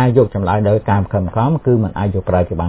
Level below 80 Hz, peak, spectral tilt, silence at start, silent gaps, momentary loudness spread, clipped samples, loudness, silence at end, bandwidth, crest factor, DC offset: -32 dBFS; 0 dBFS; -12.5 dB/octave; 0 s; none; 4 LU; under 0.1%; -16 LUFS; 0 s; 4 kHz; 14 dB; under 0.1%